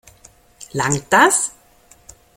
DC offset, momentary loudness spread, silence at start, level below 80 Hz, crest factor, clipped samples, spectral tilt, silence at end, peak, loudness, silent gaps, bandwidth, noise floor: under 0.1%; 13 LU; 0.6 s; -52 dBFS; 20 dB; under 0.1%; -3 dB/octave; 0.85 s; 0 dBFS; -16 LUFS; none; 16.5 kHz; -51 dBFS